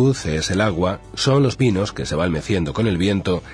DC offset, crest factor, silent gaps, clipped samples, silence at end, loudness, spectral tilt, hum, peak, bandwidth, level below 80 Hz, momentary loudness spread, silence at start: under 0.1%; 16 dB; none; under 0.1%; 0 s; -20 LUFS; -5.5 dB/octave; none; -4 dBFS; 10.5 kHz; -38 dBFS; 6 LU; 0 s